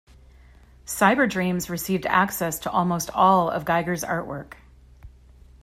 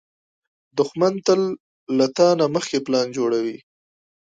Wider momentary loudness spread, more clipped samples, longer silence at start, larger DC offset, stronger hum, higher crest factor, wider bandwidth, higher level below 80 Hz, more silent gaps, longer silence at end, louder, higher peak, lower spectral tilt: about the same, 11 LU vs 12 LU; neither; about the same, 0.85 s vs 0.75 s; neither; neither; about the same, 20 dB vs 18 dB; first, 16 kHz vs 9.2 kHz; first, -50 dBFS vs -70 dBFS; second, none vs 1.60-1.87 s; second, 0.55 s vs 0.75 s; about the same, -22 LUFS vs -21 LUFS; about the same, -4 dBFS vs -4 dBFS; about the same, -4.5 dB/octave vs -5 dB/octave